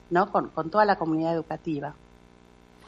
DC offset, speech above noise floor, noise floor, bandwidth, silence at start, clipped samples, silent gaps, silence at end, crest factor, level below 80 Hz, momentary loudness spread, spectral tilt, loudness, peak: under 0.1%; 29 dB; -54 dBFS; 7.6 kHz; 0.1 s; under 0.1%; none; 0.95 s; 20 dB; -60 dBFS; 10 LU; -8 dB/octave; -26 LUFS; -8 dBFS